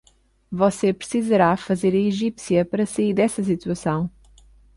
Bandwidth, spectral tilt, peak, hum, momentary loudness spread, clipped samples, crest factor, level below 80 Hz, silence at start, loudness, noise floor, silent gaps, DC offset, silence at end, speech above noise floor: 11.5 kHz; -6.5 dB/octave; -6 dBFS; none; 7 LU; under 0.1%; 16 dB; -54 dBFS; 0.5 s; -21 LUFS; -51 dBFS; none; under 0.1%; 0.65 s; 31 dB